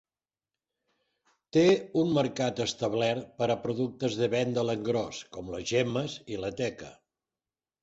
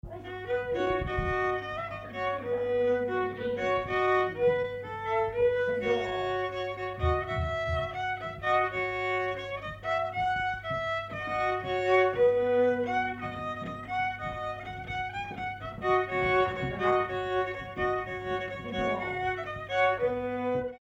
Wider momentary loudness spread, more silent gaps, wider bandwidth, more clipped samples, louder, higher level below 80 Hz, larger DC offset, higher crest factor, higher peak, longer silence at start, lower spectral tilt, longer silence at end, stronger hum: first, 12 LU vs 9 LU; neither; about the same, 8 kHz vs 8.2 kHz; neither; about the same, -29 LUFS vs -30 LUFS; second, -62 dBFS vs -48 dBFS; neither; about the same, 18 dB vs 16 dB; about the same, -12 dBFS vs -14 dBFS; first, 1.55 s vs 0.05 s; about the same, -5.5 dB/octave vs -6.5 dB/octave; first, 0.9 s vs 0.05 s; neither